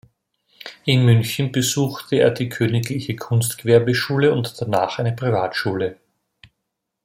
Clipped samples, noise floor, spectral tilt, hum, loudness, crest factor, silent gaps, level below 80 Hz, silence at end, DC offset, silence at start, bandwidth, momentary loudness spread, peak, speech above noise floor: under 0.1%; -78 dBFS; -5.5 dB/octave; none; -20 LUFS; 18 dB; none; -58 dBFS; 1.1 s; under 0.1%; 0.65 s; 16.5 kHz; 10 LU; -2 dBFS; 60 dB